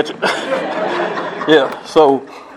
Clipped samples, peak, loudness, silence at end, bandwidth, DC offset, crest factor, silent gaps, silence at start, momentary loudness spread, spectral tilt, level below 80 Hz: under 0.1%; 0 dBFS; -15 LUFS; 0 s; 13 kHz; under 0.1%; 16 dB; none; 0 s; 8 LU; -4.5 dB/octave; -58 dBFS